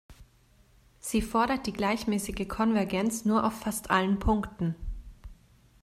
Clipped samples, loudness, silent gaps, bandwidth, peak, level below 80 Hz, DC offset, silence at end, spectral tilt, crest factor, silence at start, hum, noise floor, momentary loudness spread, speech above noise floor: under 0.1%; -29 LUFS; none; 15.5 kHz; -10 dBFS; -44 dBFS; under 0.1%; 0.5 s; -5 dB/octave; 20 dB; 0.1 s; none; -61 dBFS; 8 LU; 33 dB